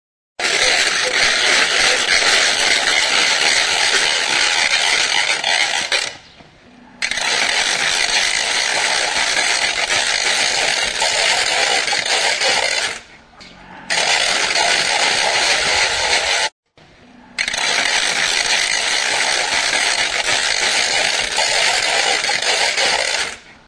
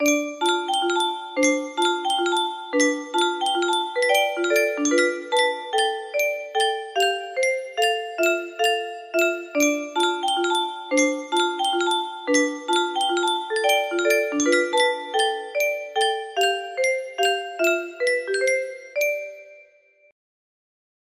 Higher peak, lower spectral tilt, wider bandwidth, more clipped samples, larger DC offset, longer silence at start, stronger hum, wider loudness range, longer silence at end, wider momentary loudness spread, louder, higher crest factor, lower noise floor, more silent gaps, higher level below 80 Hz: first, -2 dBFS vs -6 dBFS; about the same, 1 dB/octave vs 0 dB/octave; second, 11 kHz vs 15.5 kHz; neither; neither; first, 0.4 s vs 0 s; neither; about the same, 4 LU vs 2 LU; second, 0.15 s vs 1.45 s; about the same, 5 LU vs 4 LU; first, -14 LUFS vs -22 LUFS; about the same, 16 dB vs 18 dB; second, -47 dBFS vs -56 dBFS; first, 16.52-16.63 s vs none; first, -48 dBFS vs -72 dBFS